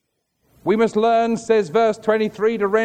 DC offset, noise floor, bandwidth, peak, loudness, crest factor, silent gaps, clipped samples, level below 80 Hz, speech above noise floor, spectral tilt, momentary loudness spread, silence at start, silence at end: under 0.1%; -68 dBFS; 9.4 kHz; -4 dBFS; -19 LUFS; 14 dB; none; under 0.1%; -60 dBFS; 50 dB; -5.5 dB/octave; 4 LU; 0.65 s; 0 s